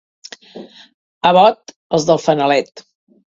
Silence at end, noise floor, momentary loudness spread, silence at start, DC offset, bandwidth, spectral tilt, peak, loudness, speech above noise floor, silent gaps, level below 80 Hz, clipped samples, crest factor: 0.55 s; -37 dBFS; 25 LU; 0.55 s; under 0.1%; 7.8 kHz; -5 dB/octave; 0 dBFS; -14 LUFS; 24 dB; 0.94-1.21 s, 1.76-1.90 s; -60 dBFS; under 0.1%; 18 dB